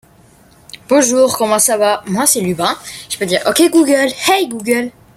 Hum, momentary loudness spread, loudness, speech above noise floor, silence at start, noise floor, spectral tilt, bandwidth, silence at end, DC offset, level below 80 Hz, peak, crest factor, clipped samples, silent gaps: none; 7 LU; -13 LUFS; 33 dB; 0.9 s; -46 dBFS; -3 dB/octave; 16.5 kHz; 0.25 s; under 0.1%; -54 dBFS; 0 dBFS; 14 dB; under 0.1%; none